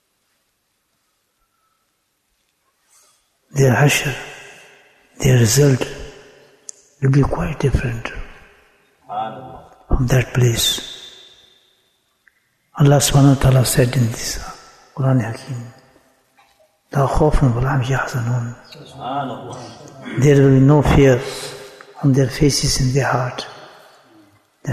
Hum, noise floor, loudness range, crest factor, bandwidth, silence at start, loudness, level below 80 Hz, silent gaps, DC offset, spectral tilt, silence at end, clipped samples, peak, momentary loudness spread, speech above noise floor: none; -68 dBFS; 7 LU; 16 dB; 14 kHz; 3.55 s; -17 LUFS; -32 dBFS; none; under 0.1%; -5.5 dB/octave; 0 s; under 0.1%; -2 dBFS; 23 LU; 52 dB